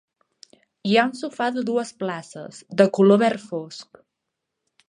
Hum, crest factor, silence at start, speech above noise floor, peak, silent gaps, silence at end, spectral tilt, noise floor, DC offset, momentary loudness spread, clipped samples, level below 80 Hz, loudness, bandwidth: none; 20 dB; 0.85 s; 60 dB; -2 dBFS; none; 1.05 s; -6 dB/octave; -81 dBFS; under 0.1%; 21 LU; under 0.1%; -74 dBFS; -21 LUFS; 10.5 kHz